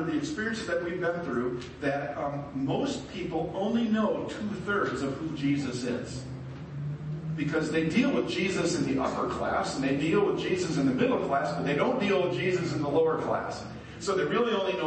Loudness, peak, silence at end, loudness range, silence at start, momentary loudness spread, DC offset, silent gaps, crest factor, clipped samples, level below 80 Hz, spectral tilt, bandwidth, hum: -29 LUFS; -14 dBFS; 0 s; 4 LU; 0 s; 9 LU; under 0.1%; none; 16 dB; under 0.1%; -54 dBFS; -6 dB/octave; 8.8 kHz; none